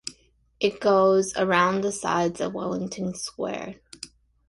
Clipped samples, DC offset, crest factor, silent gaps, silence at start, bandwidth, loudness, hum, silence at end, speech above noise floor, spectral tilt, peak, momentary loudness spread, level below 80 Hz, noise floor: under 0.1%; under 0.1%; 18 dB; none; 0.05 s; 11.5 kHz; -24 LUFS; none; 0.4 s; 34 dB; -4.5 dB/octave; -6 dBFS; 20 LU; -60 dBFS; -58 dBFS